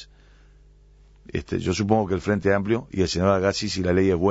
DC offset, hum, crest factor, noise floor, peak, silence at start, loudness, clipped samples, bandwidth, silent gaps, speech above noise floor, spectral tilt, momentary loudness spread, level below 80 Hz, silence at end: under 0.1%; 50 Hz at -45 dBFS; 18 dB; -52 dBFS; -6 dBFS; 0 s; -23 LUFS; under 0.1%; 8 kHz; none; 30 dB; -6 dB/octave; 7 LU; -46 dBFS; 0 s